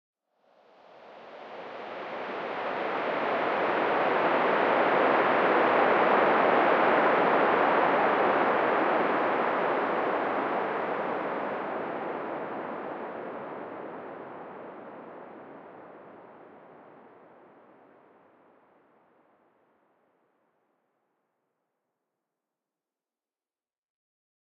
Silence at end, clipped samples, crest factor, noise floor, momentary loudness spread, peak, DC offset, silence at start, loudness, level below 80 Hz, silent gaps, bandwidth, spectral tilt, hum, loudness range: 7.75 s; under 0.1%; 20 dB; under -90 dBFS; 21 LU; -10 dBFS; under 0.1%; 1 s; -26 LUFS; -78 dBFS; none; 6.8 kHz; -6.5 dB/octave; none; 19 LU